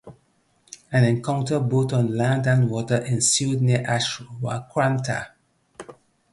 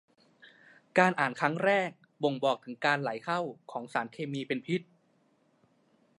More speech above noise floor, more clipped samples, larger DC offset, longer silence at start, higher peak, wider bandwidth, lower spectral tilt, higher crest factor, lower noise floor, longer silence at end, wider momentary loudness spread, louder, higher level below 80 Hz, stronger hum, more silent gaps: first, 43 dB vs 39 dB; neither; neither; second, 0.05 s vs 0.45 s; first, -4 dBFS vs -8 dBFS; about the same, 11.5 kHz vs 11.5 kHz; about the same, -5 dB/octave vs -5.5 dB/octave; second, 18 dB vs 24 dB; second, -64 dBFS vs -69 dBFS; second, 0.4 s vs 1.35 s; about the same, 11 LU vs 10 LU; first, -22 LUFS vs -31 LUFS; first, -58 dBFS vs -84 dBFS; neither; neither